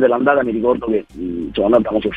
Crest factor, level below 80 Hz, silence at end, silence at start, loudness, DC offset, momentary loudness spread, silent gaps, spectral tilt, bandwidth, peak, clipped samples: 16 dB; -42 dBFS; 0 s; 0 s; -17 LUFS; 0.2%; 9 LU; none; -8 dB/octave; 4.7 kHz; 0 dBFS; under 0.1%